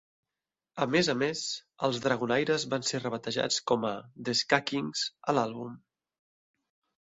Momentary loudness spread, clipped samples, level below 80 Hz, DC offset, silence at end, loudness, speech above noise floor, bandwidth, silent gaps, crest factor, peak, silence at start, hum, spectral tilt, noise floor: 9 LU; under 0.1%; -70 dBFS; under 0.1%; 1.25 s; -30 LUFS; over 60 dB; 8.4 kHz; none; 24 dB; -6 dBFS; 0.75 s; none; -3.5 dB/octave; under -90 dBFS